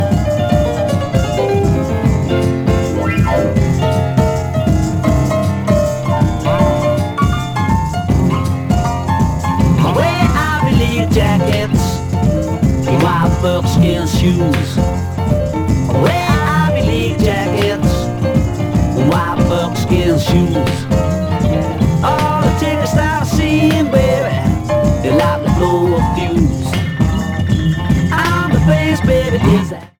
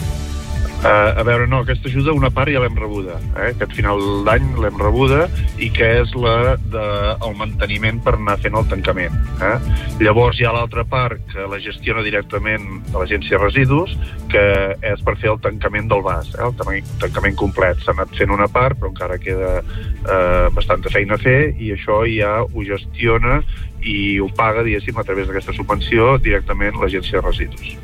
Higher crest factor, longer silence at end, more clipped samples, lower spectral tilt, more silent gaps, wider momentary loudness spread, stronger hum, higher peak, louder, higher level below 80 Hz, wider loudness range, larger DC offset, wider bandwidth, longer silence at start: about the same, 14 dB vs 16 dB; first, 0.15 s vs 0 s; neither; about the same, -6.5 dB/octave vs -7 dB/octave; neither; second, 3 LU vs 9 LU; neither; about the same, 0 dBFS vs 0 dBFS; first, -14 LUFS vs -17 LUFS; about the same, -24 dBFS vs -24 dBFS; about the same, 1 LU vs 2 LU; neither; first, 19 kHz vs 14.5 kHz; about the same, 0 s vs 0 s